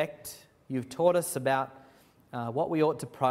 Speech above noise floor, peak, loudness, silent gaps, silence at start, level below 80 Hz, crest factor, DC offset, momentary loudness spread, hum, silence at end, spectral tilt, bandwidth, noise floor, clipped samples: 30 dB; -10 dBFS; -30 LUFS; none; 0 s; -70 dBFS; 20 dB; under 0.1%; 16 LU; none; 0 s; -5.5 dB/octave; 16 kHz; -59 dBFS; under 0.1%